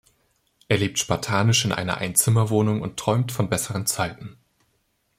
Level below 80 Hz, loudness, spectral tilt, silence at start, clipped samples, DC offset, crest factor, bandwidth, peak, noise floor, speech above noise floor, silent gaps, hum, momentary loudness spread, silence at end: -54 dBFS; -22 LUFS; -4 dB/octave; 0.7 s; under 0.1%; under 0.1%; 22 dB; 16.5 kHz; -2 dBFS; -69 dBFS; 47 dB; none; none; 7 LU; 0.85 s